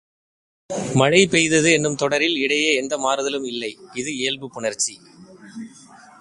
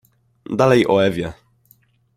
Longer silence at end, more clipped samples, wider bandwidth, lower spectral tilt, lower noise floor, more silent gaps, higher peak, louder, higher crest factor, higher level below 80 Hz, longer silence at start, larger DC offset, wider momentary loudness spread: second, 0.25 s vs 0.85 s; neither; second, 11.5 kHz vs 16 kHz; second, -3 dB/octave vs -6.5 dB/octave; second, -46 dBFS vs -57 dBFS; neither; about the same, 0 dBFS vs -2 dBFS; about the same, -19 LUFS vs -17 LUFS; about the same, 22 dB vs 18 dB; about the same, -56 dBFS vs -52 dBFS; first, 0.7 s vs 0.5 s; neither; first, 17 LU vs 13 LU